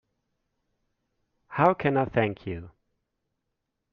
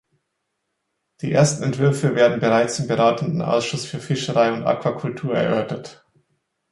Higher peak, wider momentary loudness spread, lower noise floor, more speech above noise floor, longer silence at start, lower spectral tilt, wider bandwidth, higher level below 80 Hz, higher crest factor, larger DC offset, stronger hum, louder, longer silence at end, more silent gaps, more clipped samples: second, -6 dBFS vs -2 dBFS; first, 15 LU vs 9 LU; first, -82 dBFS vs -76 dBFS; about the same, 56 dB vs 56 dB; first, 1.5 s vs 1.2 s; about the same, -6 dB/octave vs -5.5 dB/octave; second, 6.6 kHz vs 11.5 kHz; about the same, -60 dBFS vs -60 dBFS; first, 24 dB vs 18 dB; neither; neither; second, -25 LUFS vs -20 LUFS; first, 1.25 s vs 0.8 s; neither; neither